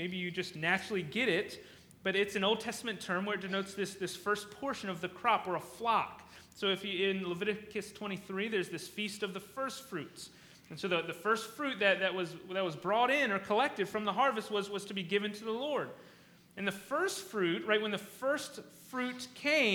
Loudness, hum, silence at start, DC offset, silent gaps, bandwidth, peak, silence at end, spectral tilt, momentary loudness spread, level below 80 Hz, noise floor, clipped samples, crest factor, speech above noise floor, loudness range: -34 LUFS; none; 0 s; under 0.1%; none; over 20 kHz; -14 dBFS; 0 s; -4 dB/octave; 11 LU; -74 dBFS; -60 dBFS; under 0.1%; 22 dB; 25 dB; 5 LU